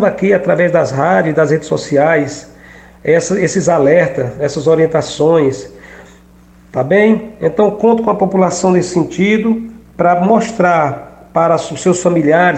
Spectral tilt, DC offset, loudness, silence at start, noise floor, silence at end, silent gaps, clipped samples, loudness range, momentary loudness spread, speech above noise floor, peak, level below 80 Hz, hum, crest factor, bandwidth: -6 dB/octave; under 0.1%; -13 LUFS; 0 s; -43 dBFS; 0 s; none; under 0.1%; 2 LU; 8 LU; 31 dB; 0 dBFS; -46 dBFS; none; 12 dB; 9.2 kHz